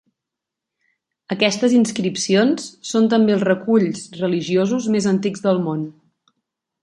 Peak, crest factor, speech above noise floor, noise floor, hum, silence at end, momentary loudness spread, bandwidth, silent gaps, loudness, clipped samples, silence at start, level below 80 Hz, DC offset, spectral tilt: -2 dBFS; 18 dB; 66 dB; -84 dBFS; none; 0.9 s; 9 LU; 11.5 kHz; none; -19 LUFS; under 0.1%; 1.3 s; -66 dBFS; under 0.1%; -5 dB/octave